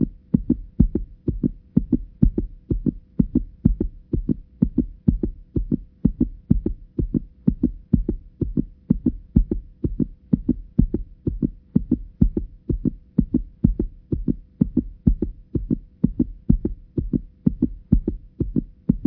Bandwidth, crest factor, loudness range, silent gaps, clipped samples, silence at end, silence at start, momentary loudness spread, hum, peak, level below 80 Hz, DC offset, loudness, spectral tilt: 1.6 kHz; 22 dB; 1 LU; none; under 0.1%; 0 s; 0 s; 7 LU; none; 0 dBFS; -28 dBFS; under 0.1%; -25 LUFS; -15 dB/octave